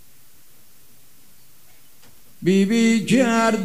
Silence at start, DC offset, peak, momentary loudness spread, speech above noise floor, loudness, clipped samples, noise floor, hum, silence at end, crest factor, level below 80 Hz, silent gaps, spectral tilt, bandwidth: 2.4 s; 0.8%; -6 dBFS; 4 LU; 36 dB; -18 LUFS; under 0.1%; -54 dBFS; none; 0 s; 16 dB; -64 dBFS; none; -5.5 dB/octave; 16 kHz